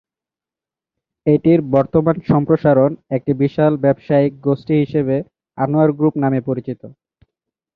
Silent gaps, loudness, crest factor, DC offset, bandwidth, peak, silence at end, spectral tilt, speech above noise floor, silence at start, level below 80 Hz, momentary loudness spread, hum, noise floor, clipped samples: none; -16 LUFS; 16 dB; under 0.1%; 5 kHz; -2 dBFS; 0.85 s; -11.5 dB/octave; 73 dB; 1.25 s; -52 dBFS; 9 LU; none; -89 dBFS; under 0.1%